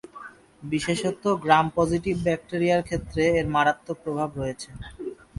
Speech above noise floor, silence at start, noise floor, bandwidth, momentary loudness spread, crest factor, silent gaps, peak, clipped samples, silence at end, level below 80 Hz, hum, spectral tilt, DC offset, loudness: 21 dB; 0.15 s; -45 dBFS; 11.5 kHz; 18 LU; 22 dB; none; -4 dBFS; under 0.1%; 0.25 s; -48 dBFS; none; -5.5 dB/octave; under 0.1%; -24 LUFS